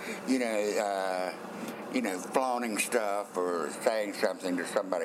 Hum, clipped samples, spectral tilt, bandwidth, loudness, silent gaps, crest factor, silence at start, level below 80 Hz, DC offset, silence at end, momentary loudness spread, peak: none; under 0.1%; -3.5 dB/octave; 16 kHz; -31 LUFS; none; 20 dB; 0 s; -86 dBFS; under 0.1%; 0 s; 5 LU; -10 dBFS